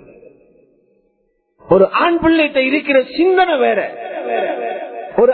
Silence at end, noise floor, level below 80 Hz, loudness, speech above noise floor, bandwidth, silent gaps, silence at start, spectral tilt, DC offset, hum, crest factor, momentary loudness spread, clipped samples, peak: 0 s; -64 dBFS; -48 dBFS; -15 LUFS; 50 dB; 4.5 kHz; none; 1.65 s; -10 dB/octave; under 0.1%; none; 16 dB; 11 LU; under 0.1%; 0 dBFS